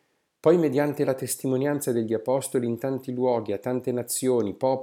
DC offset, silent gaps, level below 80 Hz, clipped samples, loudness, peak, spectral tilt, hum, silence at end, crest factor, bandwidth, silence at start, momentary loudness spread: under 0.1%; none; -74 dBFS; under 0.1%; -25 LUFS; -8 dBFS; -5.5 dB/octave; none; 0 s; 18 dB; 17.5 kHz; 0.45 s; 7 LU